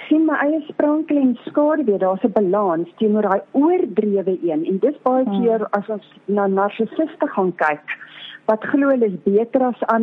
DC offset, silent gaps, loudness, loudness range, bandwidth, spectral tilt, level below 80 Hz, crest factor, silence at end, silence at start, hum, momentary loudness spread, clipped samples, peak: under 0.1%; none; -19 LUFS; 3 LU; 4.1 kHz; -9.5 dB/octave; -70 dBFS; 14 dB; 0 s; 0 s; none; 5 LU; under 0.1%; -4 dBFS